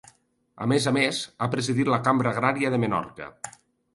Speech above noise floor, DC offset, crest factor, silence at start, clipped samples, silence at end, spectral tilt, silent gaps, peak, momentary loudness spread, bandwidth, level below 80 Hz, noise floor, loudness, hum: 34 dB; under 0.1%; 20 dB; 0.55 s; under 0.1%; 0.45 s; -5 dB/octave; none; -6 dBFS; 16 LU; 11.5 kHz; -62 dBFS; -59 dBFS; -24 LUFS; none